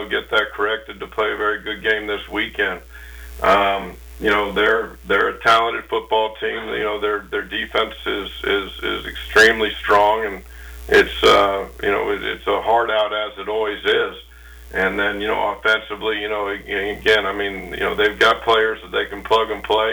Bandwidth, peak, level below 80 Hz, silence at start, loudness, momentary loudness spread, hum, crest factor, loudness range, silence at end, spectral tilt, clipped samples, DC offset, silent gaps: over 20 kHz; -6 dBFS; -40 dBFS; 0 s; -19 LUFS; 10 LU; none; 14 dB; 5 LU; 0 s; -3.5 dB/octave; under 0.1%; under 0.1%; none